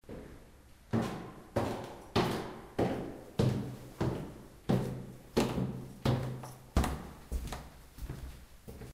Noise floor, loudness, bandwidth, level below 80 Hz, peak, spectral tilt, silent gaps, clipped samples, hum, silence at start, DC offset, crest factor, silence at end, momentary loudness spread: -57 dBFS; -36 LUFS; 16 kHz; -46 dBFS; -14 dBFS; -6.5 dB/octave; none; under 0.1%; none; 0.05 s; under 0.1%; 22 dB; 0 s; 16 LU